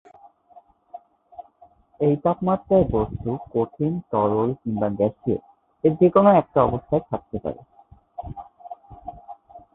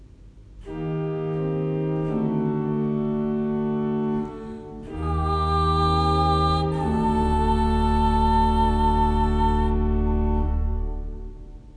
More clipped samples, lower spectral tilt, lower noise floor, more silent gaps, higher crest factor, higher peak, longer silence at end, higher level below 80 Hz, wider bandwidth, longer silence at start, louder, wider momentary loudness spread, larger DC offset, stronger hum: neither; first, -12.5 dB/octave vs -8 dB/octave; first, -55 dBFS vs -46 dBFS; neither; first, 22 dB vs 14 dB; first, -2 dBFS vs -8 dBFS; first, 0.15 s vs 0 s; second, -46 dBFS vs -28 dBFS; second, 4 kHz vs 10.5 kHz; first, 0.55 s vs 0 s; about the same, -22 LUFS vs -23 LUFS; first, 24 LU vs 12 LU; neither; neither